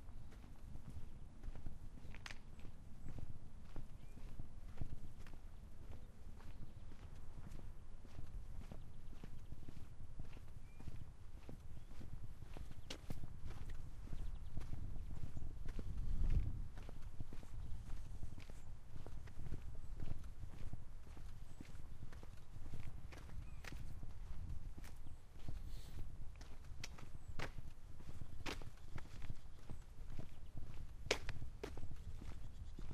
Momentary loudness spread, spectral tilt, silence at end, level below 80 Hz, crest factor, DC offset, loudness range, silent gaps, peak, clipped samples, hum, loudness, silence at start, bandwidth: 8 LU; -5 dB/octave; 0 s; -48 dBFS; 30 dB; under 0.1%; 8 LU; none; -14 dBFS; under 0.1%; none; -54 LUFS; 0 s; 8.8 kHz